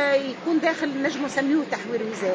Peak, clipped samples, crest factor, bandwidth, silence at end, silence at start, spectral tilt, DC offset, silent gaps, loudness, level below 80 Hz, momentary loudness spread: -8 dBFS; under 0.1%; 16 dB; 8 kHz; 0 s; 0 s; -4.5 dB/octave; under 0.1%; none; -24 LUFS; -70 dBFS; 5 LU